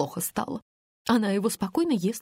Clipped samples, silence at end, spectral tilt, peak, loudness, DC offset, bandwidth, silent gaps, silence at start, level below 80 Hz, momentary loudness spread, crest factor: under 0.1%; 0 s; -5 dB/octave; -10 dBFS; -27 LUFS; under 0.1%; 16 kHz; 0.62-1.05 s; 0 s; -62 dBFS; 11 LU; 18 dB